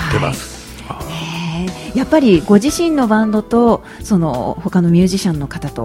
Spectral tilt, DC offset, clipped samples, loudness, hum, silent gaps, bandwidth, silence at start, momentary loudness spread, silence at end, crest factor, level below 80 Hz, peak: -6 dB/octave; under 0.1%; under 0.1%; -15 LUFS; none; none; 16 kHz; 0 s; 14 LU; 0 s; 14 dB; -36 dBFS; 0 dBFS